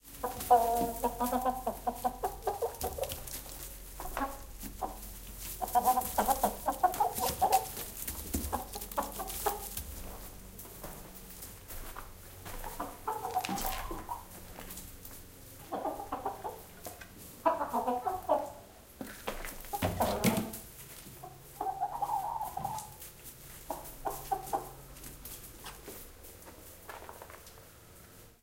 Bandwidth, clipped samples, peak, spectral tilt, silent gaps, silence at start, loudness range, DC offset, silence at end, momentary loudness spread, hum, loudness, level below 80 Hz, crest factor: 17 kHz; under 0.1%; -12 dBFS; -4 dB/octave; none; 0.05 s; 11 LU; under 0.1%; 0.1 s; 18 LU; none; -35 LUFS; -50 dBFS; 24 dB